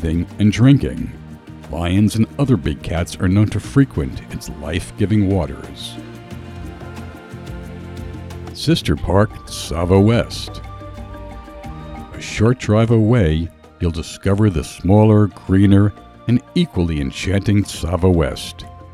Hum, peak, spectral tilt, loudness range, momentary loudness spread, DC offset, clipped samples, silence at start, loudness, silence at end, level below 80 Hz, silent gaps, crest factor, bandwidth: none; 0 dBFS; -7 dB/octave; 7 LU; 20 LU; under 0.1%; under 0.1%; 0 s; -17 LUFS; 0 s; -32 dBFS; none; 18 dB; 13 kHz